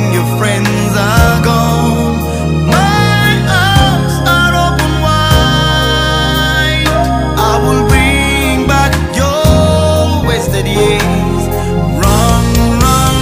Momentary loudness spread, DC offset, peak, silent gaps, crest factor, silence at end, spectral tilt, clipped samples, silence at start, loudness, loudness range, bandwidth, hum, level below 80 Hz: 4 LU; under 0.1%; 0 dBFS; none; 10 dB; 0 s; -5 dB/octave; 0.1%; 0 s; -10 LUFS; 1 LU; 16.5 kHz; none; -18 dBFS